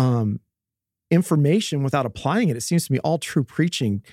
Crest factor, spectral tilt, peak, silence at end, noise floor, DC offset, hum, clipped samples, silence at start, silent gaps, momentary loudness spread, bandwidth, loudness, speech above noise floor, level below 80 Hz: 16 dB; -6 dB/octave; -6 dBFS; 0.1 s; -87 dBFS; under 0.1%; none; under 0.1%; 0 s; none; 5 LU; 15.5 kHz; -22 LUFS; 66 dB; -60 dBFS